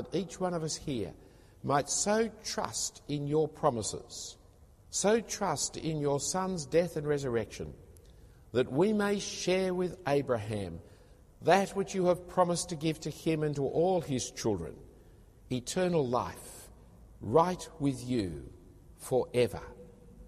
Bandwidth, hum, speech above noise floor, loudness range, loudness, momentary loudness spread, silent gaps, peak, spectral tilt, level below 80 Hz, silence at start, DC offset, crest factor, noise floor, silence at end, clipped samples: 15 kHz; none; 27 dB; 3 LU; -32 LUFS; 14 LU; none; -12 dBFS; -4.5 dB/octave; -56 dBFS; 0 s; under 0.1%; 22 dB; -58 dBFS; 0 s; under 0.1%